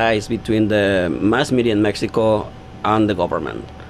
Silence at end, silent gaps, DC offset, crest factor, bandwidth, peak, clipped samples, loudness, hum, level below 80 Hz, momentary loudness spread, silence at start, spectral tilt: 0 s; none; under 0.1%; 16 dB; 12.5 kHz; -2 dBFS; under 0.1%; -18 LUFS; none; -42 dBFS; 7 LU; 0 s; -6 dB/octave